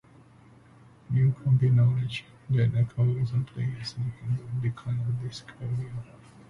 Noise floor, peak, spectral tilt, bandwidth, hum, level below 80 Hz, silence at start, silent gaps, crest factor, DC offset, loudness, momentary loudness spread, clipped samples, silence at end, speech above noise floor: -54 dBFS; -14 dBFS; -8 dB/octave; 7.2 kHz; none; -56 dBFS; 1.1 s; none; 14 dB; under 0.1%; -28 LUFS; 14 LU; under 0.1%; 0.45 s; 28 dB